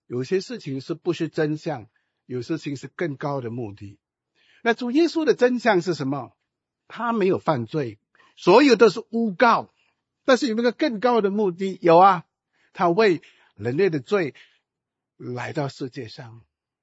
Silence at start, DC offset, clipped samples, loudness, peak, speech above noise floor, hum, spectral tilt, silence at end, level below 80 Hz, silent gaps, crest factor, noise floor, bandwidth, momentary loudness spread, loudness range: 0.1 s; under 0.1%; under 0.1%; -22 LUFS; -2 dBFS; 64 dB; none; -6 dB/octave; 0.45 s; -72 dBFS; none; 20 dB; -85 dBFS; 8 kHz; 16 LU; 9 LU